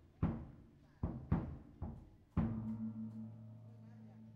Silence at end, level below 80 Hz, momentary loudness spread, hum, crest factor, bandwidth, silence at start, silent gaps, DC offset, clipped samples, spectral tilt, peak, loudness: 0 s; -54 dBFS; 17 LU; none; 22 dB; 4.9 kHz; 0 s; none; under 0.1%; under 0.1%; -11 dB/octave; -22 dBFS; -44 LUFS